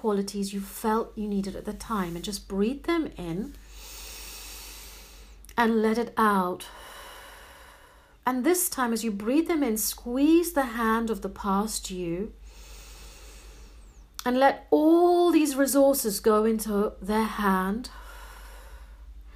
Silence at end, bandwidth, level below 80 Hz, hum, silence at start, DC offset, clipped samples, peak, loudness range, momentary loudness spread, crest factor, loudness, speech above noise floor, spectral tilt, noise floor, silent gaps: 0.05 s; 15.5 kHz; -48 dBFS; none; 0.05 s; under 0.1%; under 0.1%; -8 dBFS; 9 LU; 23 LU; 20 dB; -26 LUFS; 29 dB; -4.5 dB/octave; -54 dBFS; none